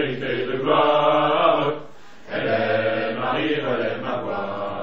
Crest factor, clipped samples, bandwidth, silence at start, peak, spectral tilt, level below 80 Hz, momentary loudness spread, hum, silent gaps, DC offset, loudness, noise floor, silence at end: 18 dB; under 0.1%; 6.8 kHz; 0 s; -4 dBFS; -7 dB/octave; -62 dBFS; 9 LU; none; none; 1%; -21 LUFS; -44 dBFS; 0 s